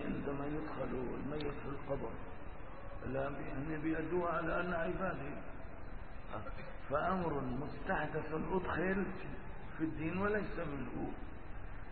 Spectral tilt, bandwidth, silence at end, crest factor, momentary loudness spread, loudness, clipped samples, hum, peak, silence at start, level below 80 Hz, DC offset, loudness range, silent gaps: -6 dB/octave; 4.5 kHz; 0 s; 16 dB; 15 LU; -40 LUFS; under 0.1%; none; -22 dBFS; 0 s; -50 dBFS; 0.5%; 4 LU; none